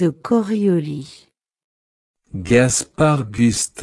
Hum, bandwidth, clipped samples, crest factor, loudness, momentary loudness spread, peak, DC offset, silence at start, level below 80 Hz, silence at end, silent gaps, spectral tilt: none; 12 kHz; under 0.1%; 18 dB; -17 LUFS; 17 LU; 0 dBFS; under 0.1%; 0 s; -48 dBFS; 0 s; 1.64-2.14 s; -5 dB/octave